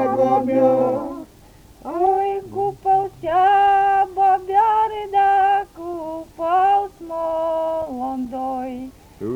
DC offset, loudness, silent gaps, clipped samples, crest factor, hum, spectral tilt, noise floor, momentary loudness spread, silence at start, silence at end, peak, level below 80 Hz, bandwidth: under 0.1%; -19 LUFS; none; under 0.1%; 14 dB; none; -6.5 dB/octave; -47 dBFS; 15 LU; 0 s; 0 s; -6 dBFS; -52 dBFS; 10.5 kHz